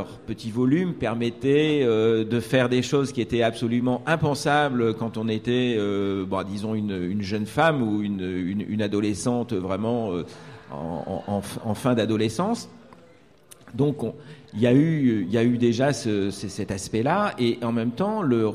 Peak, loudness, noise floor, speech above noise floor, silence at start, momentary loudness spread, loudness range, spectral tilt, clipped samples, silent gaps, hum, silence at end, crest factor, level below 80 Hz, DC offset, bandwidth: -8 dBFS; -24 LUFS; -54 dBFS; 30 dB; 0 s; 10 LU; 5 LU; -6.5 dB/octave; under 0.1%; none; none; 0 s; 16 dB; -56 dBFS; 0.1%; 14 kHz